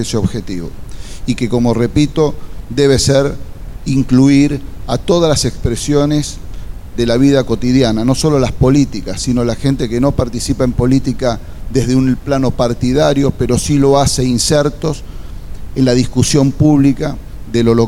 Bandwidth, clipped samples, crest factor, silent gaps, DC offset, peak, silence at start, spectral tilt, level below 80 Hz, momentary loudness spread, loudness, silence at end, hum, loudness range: 15.5 kHz; under 0.1%; 12 dB; none; under 0.1%; 0 dBFS; 0 s; -6 dB/octave; -26 dBFS; 14 LU; -13 LUFS; 0 s; none; 2 LU